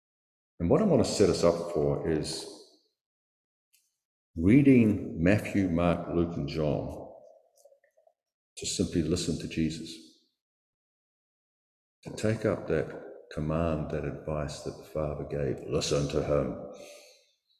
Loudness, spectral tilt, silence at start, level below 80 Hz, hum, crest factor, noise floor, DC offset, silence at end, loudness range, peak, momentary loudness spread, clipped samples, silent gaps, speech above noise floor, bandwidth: -28 LUFS; -6 dB/octave; 0.6 s; -48 dBFS; none; 22 dB; -67 dBFS; under 0.1%; 0.6 s; 9 LU; -8 dBFS; 19 LU; under 0.1%; 3.01-3.72 s, 4.05-4.34 s, 8.34-8.56 s, 10.41-12.03 s; 39 dB; 13.5 kHz